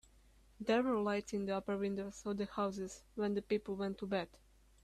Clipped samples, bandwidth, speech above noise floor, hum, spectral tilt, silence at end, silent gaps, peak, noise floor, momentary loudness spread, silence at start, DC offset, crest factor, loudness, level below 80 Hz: under 0.1%; 13 kHz; 28 dB; none; -6 dB/octave; 0.45 s; none; -22 dBFS; -66 dBFS; 8 LU; 0.6 s; under 0.1%; 16 dB; -39 LUFS; -66 dBFS